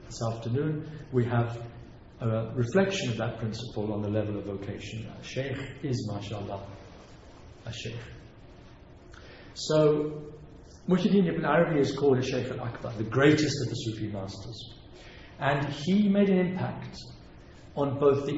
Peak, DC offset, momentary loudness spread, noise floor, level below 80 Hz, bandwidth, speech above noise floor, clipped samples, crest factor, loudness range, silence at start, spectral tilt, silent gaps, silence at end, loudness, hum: -8 dBFS; under 0.1%; 21 LU; -50 dBFS; -54 dBFS; 8 kHz; 22 dB; under 0.1%; 20 dB; 11 LU; 0 s; -6.5 dB/octave; none; 0 s; -29 LUFS; none